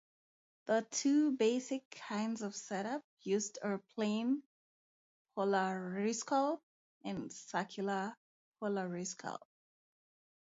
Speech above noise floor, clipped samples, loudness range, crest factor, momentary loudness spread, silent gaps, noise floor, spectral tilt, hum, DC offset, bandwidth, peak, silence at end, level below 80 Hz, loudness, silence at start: over 54 dB; under 0.1%; 6 LU; 18 dB; 12 LU; 1.85-1.91 s, 3.04-3.17 s, 4.46-5.25 s, 6.63-7.01 s, 8.17-8.52 s; under -90 dBFS; -4.5 dB/octave; none; under 0.1%; 7.6 kHz; -20 dBFS; 1.05 s; -84 dBFS; -37 LUFS; 0.65 s